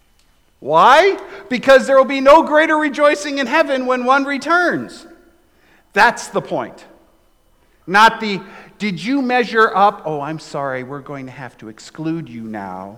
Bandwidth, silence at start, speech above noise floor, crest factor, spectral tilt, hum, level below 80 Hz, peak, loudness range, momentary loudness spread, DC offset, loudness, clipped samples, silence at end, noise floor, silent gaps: 16 kHz; 0.6 s; 41 dB; 16 dB; -4.5 dB/octave; none; -52 dBFS; -2 dBFS; 7 LU; 19 LU; under 0.1%; -15 LUFS; under 0.1%; 0 s; -56 dBFS; none